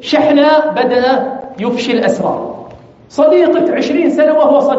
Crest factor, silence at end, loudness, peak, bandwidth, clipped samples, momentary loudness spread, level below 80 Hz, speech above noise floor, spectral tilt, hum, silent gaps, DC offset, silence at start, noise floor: 12 dB; 0 s; -12 LUFS; 0 dBFS; 8 kHz; under 0.1%; 13 LU; -54 dBFS; 24 dB; -3.5 dB/octave; none; none; under 0.1%; 0 s; -35 dBFS